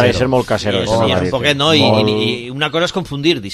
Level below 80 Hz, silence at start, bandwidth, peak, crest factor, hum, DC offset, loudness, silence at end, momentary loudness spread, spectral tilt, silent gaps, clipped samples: -38 dBFS; 0 s; 14 kHz; 0 dBFS; 14 dB; none; under 0.1%; -15 LUFS; 0 s; 7 LU; -5 dB/octave; none; under 0.1%